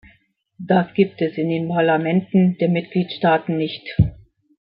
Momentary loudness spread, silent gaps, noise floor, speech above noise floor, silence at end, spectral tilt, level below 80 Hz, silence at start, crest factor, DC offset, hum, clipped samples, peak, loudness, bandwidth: 7 LU; none; -59 dBFS; 40 dB; 0.6 s; -12 dB/octave; -42 dBFS; 0.6 s; 18 dB; under 0.1%; none; under 0.1%; -2 dBFS; -20 LUFS; 5.2 kHz